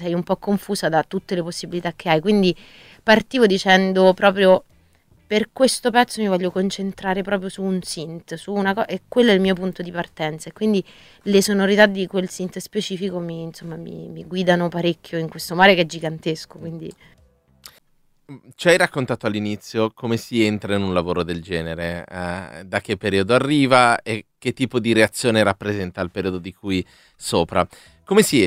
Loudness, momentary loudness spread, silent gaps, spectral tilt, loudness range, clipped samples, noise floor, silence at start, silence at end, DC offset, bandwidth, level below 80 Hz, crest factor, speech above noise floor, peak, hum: -20 LUFS; 14 LU; none; -5 dB/octave; 6 LU; under 0.1%; -60 dBFS; 0 s; 0 s; under 0.1%; 16 kHz; -52 dBFS; 20 dB; 40 dB; 0 dBFS; none